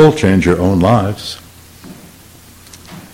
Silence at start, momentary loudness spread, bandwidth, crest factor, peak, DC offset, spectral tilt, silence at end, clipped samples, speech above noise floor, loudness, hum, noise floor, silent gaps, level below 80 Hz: 0 s; 25 LU; 16.5 kHz; 14 dB; 0 dBFS; under 0.1%; -6.5 dB/octave; 0.1 s; 0.1%; 28 dB; -13 LUFS; none; -40 dBFS; none; -38 dBFS